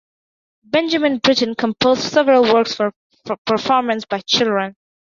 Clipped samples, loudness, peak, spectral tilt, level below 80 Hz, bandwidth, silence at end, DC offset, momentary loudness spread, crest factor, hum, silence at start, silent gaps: under 0.1%; -17 LUFS; 0 dBFS; -4 dB/octave; -58 dBFS; 7.4 kHz; 0.35 s; under 0.1%; 9 LU; 16 dB; none; 0.75 s; 2.96-3.10 s, 3.38-3.45 s